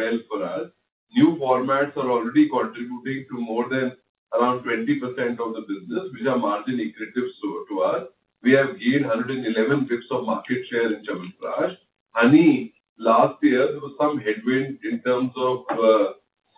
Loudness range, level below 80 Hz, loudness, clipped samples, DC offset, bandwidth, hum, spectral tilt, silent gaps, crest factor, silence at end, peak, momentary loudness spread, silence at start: 6 LU; -70 dBFS; -23 LUFS; under 0.1%; under 0.1%; 4 kHz; none; -10.5 dB/octave; 0.92-1.07 s, 4.09-4.27 s, 12.00-12.06 s, 12.89-12.96 s; 18 dB; 0.45 s; -4 dBFS; 11 LU; 0 s